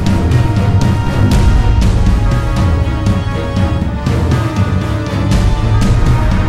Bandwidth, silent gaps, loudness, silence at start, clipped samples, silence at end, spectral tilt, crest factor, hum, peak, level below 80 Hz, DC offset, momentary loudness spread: 13 kHz; none; -13 LUFS; 0 s; under 0.1%; 0 s; -7 dB/octave; 10 dB; none; 0 dBFS; -16 dBFS; under 0.1%; 4 LU